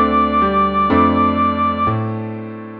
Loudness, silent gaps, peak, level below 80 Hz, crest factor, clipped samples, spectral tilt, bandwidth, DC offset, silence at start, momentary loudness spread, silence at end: -16 LUFS; none; -2 dBFS; -36 dBFS; 14 dB; under 0.1%; -9.5 dB/octave; 5 kHz; under 0.1%; 0 s; 11 LU; 0 s